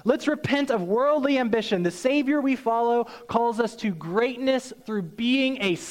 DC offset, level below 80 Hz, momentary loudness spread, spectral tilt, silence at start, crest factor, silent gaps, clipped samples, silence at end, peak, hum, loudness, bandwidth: under 0.1%; -62 dBFS; 5 LU; -5.5 dB/octave; 0.05 s; 16 dB; none; under 0.1%; 0 s; -8 dBFS; none; -24 LUFS; 15.5 kHz